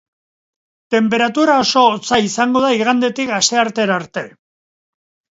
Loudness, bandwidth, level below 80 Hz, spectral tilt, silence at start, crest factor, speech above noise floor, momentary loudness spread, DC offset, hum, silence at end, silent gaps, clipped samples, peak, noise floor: -15 LUFS; 8 kHz; -58 dBFS; -3 dB/octave; 0.9 s; 16 dB; over 75 dB; 7 LU; under 0.1%; none; 1.1 s; none; under 0.1%; 0 dBFS; under -90 dBFS